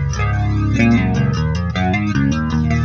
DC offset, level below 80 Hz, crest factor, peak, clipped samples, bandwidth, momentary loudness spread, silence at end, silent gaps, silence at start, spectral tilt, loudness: under 0.1%; -26 dBFS; 12 dB; -2 dBFS; under 0.1%; 7.2 kHz; 5 LU; 0 s; none; 0 s; -7 dB/octave; -17 LUFS